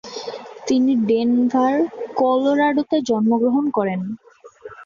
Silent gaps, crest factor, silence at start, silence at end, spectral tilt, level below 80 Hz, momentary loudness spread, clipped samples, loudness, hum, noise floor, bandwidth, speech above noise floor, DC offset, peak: none; 14 dB; 0.05 s; 0 s; -6 dB/octave; -62 dBFS; 14 LU; under 0.1%; -19 LUFS; none; -41 dBFS; 7.4 kHz; 23 dB; under 0.1%; -6 dBFS